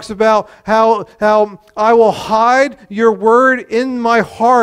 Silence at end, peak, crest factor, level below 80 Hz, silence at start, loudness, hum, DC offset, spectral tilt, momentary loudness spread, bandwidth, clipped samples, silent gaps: 0 s; 0 dBFS; 12 dB; -50 dBFS; 0 s; -12 LUFS; none; under 0.1%; -5 dB/octave; 6 LU; 11.5 kHz; under 0.1%; none